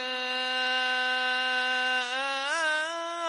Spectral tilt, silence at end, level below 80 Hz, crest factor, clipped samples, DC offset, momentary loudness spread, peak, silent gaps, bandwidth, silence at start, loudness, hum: 1.5 dB/octave; 0 s; -84 dBFS; 12 dB; under 0.1%; under 0.1%; 3 LU; -16 dBFS; none; 11.5 kHz; 0 s; -27 LUFS; none